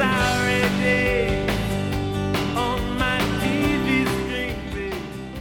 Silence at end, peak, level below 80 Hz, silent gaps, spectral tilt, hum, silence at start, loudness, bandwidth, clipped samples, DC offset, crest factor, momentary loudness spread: 0 s; -6 dBFS; -34 dBFS; none; -5 dB/octave; none; 0 s; -22 LUFS; 19 kHz; under 0.1%; under 0.1%; 16 dB; 9 LU